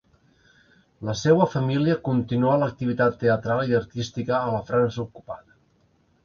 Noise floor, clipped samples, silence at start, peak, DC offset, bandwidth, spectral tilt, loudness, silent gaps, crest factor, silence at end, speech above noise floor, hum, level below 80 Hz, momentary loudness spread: -63 dBFS; under 0.1%; 1 s; -4 dBFS; under 0.1%; 7.2 kHz; -7 dB/octave; -23 LUFS; none; 20 dB; 0.9 s; 41 dB; none; -56 dBFS; 14 LU